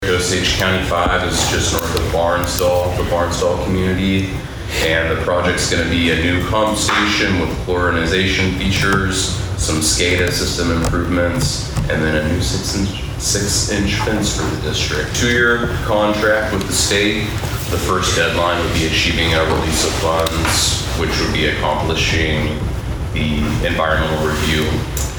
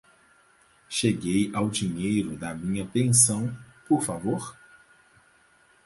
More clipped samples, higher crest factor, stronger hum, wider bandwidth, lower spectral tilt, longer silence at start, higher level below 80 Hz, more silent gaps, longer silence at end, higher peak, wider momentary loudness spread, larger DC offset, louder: neither; second, 16 dB vs 22 dB; neither; first, over 20 kHz vs 12 kHz; about the same, -4 dB/octave vs -4 dB/octave; second, 0 s vs 0.9 s; first, -28 dBFS vs -56 dBFS; neither; second, 0 s vs 1.3 s; first, 0 dBFS vs -6 dBFS; second, 5 LU vs 14 LU; neither; first, -16 LUFS vs -25 LUFS